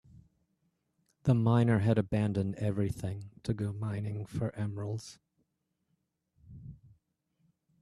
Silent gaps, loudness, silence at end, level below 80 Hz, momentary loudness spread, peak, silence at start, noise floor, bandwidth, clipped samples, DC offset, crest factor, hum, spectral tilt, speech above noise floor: none; -32 LUFS; 1.05 s; -58 dBFS; 19 LU; -14 dBFS; 0.15 s; -81 dBFS; 11.5 kHz; under 0.1%; under 0.1%; 20 dB; none; -8 dB/octave; 50 dB